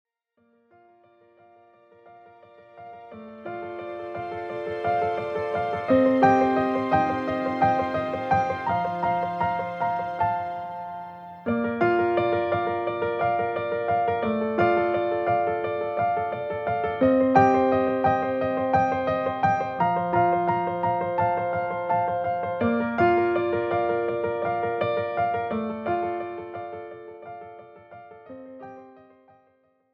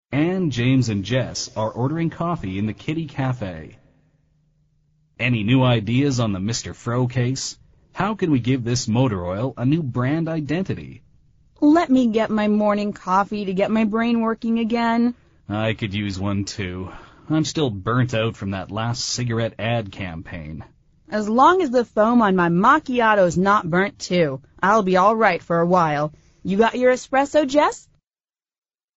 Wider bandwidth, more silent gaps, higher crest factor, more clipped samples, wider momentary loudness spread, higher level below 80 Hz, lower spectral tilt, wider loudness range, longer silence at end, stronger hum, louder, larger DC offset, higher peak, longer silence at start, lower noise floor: second, 7 kHz vs 8 kHz; neither; about the same, 20 dB vs 18 dB; neither; first, 16 LU vs 12 LU; second, -58 dBFS vs -50 dBFS; first, -8 dB/octave vs -5.5 dB/octave; first, 12 LU vs 7 LU; second, 1 s vs 1.2 s; neither; second, -24 LUFS vs -20 LUFS; neither; second, -6 dBFS vs -2 dBFS; first, 2.05 s vs 0.1 s; second, -67 dBFS vs under -90 dBFS